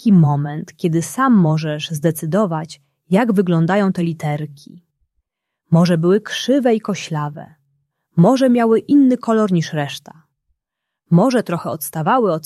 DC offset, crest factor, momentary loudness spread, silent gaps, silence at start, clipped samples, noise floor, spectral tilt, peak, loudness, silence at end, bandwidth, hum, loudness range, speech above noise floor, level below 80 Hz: under 0.1%; 14 dB; 11 LU; none; 0.05 s; under 0.1%; -80 dBFS; -7 dB/octave; -2 dBFS; -17 LUFS; 0.05 s; 14 kHz; none; 3 LU; 64 dB; -62 dBFS